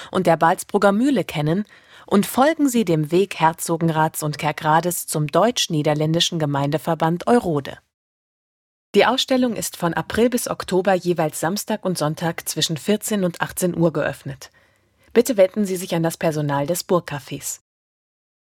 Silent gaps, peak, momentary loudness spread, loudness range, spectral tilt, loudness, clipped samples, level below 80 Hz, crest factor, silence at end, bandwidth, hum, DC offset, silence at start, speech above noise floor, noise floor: 7.94-8.94 s; -2 dBFS; 8 LU; 3 LU; -5 dB/octave; -20 LUFS; under 0.1%; -56 dBFS; 20 dB; 0.95 s; 18 kHz; none; under 0.1%; 0 s; 38 dB; -58 dBFS